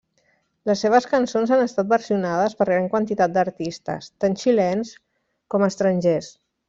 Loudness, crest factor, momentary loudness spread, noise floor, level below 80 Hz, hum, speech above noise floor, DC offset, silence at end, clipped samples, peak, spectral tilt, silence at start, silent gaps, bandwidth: -21 LUFS; 16 dB; 10 LU; -66 dBFS; -62 dBFS; none; 45 dB; under 0.1%; 0.4 s; under 0.1%; -4 dBFS; -6 dB/octave; 0.65 s; none; 7.8 kHz